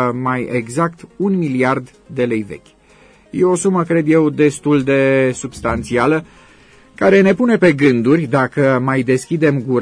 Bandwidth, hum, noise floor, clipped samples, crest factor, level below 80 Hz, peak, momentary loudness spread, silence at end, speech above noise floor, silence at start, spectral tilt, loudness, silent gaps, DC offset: 11 kHz; none; -47 dBFS; under 0.1%; 14 dB; -46 dBFS; -2 dBFS; 9 LU; 0 s; 33 dB; 0 s; -6.5 dB/octave; -15 LUFS; none; under 0.1%